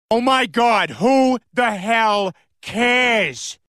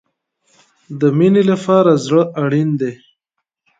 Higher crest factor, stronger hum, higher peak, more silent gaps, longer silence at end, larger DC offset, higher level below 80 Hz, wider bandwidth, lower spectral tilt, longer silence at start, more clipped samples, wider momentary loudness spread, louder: about the same, 14 dB vs 16 dB; neither; second, -4 dBFS vs 0 dBFS; neither; second, 0.15 s vs 0.85 s; neither; about the same, -58 dBFS vs -62 dBFS; first, 14 kHz vs 9.2 kHz; second, -3.5 dB/octave vs -7.5 dB/octave; second, 0.1 s vs 0.9 s; neither; about the same, 8 LU vs 9 LU; second, -17 LUFS vs -14 LUFS